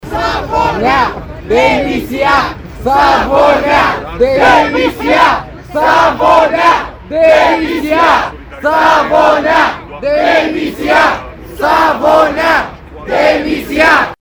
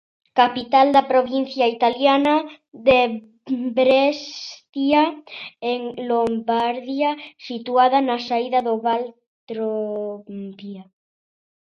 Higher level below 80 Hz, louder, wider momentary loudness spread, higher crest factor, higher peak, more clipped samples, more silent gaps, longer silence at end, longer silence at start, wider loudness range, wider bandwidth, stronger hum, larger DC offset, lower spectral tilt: first, -32 dBFS vs -60 dBFS; first, -10 LUFS vs -20 LUFS; second, 9 LU vs 17 LU; second, 10 dB vs 18 dB; about the same, 0 dBFS vs -2 dBFS; first, 0.4% vs under 0.1%; second, none vs 4.69-4.73 s, 9.27-9.47 s; second, 0.05 s vs 0.9 s; second, 0.05 s vs 0.35 s; second, 2 LU vs 5 LU; first, over 20 kHz vs 7 kHz; neither; neither; about the same, -4.5 dB/octave vs -5 dB/octave